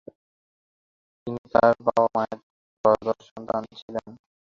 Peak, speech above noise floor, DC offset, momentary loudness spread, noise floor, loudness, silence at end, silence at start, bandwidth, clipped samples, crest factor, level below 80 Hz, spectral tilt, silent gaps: -4 dBFS; over 67 dB; under 0.1%; 15 LU; under -90 dBFS; -24 LUFS; 0.4 s; 1.25 s; 7.2 kHz; under 0.1%; 22 dB; -60 dBFS; -7 dB/octave; 1.38-1.44 s, 2.43-2.84 s, 3.31-3.36 s, 3.82-3.88 s